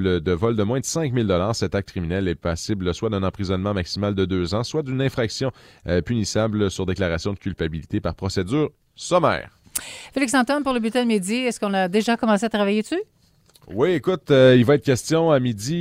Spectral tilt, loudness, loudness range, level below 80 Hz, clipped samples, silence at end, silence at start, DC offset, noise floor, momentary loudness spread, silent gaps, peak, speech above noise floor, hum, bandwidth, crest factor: -5.5 dB/octave; -22 LUFS; 5 LU; -44 dBFS; under 0.1%; 0 s; 0 s; under 0.1%; -55 dBFS; 9 LU; none; -2 dBFS; 34 dB; none; 16 kHz; 20 dB